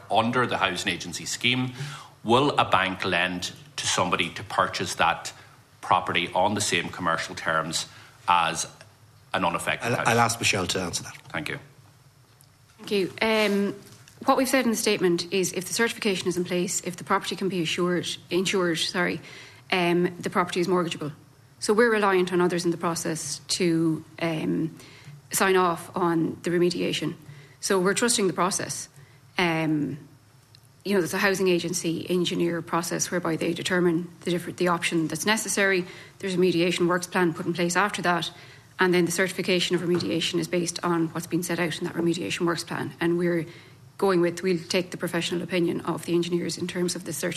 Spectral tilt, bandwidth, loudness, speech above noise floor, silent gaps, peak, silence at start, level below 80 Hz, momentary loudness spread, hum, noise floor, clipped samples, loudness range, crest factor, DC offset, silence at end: -4 dB/octave; 14 kHz; -25 LUFS; 31 dB; none; -4 dBFS; 0 s; -62 dBFS; 10 LU; none; -56 dBFS; under 0.1%; 2 LU; 20 dB; under 0.1%; 0 s